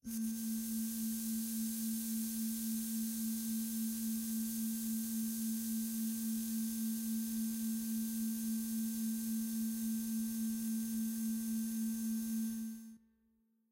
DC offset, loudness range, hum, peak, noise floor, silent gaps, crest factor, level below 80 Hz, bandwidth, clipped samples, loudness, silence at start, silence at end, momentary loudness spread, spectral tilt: under 0.1%; 0 LU; none; -28 dBFS; -76 dBFS; none; 10 dB; -70 dBFS; 16 kHz; under 0.1%; -38 LUFS; 0.05 s; 0.75 s; 1 LU; -3.5 dB/octave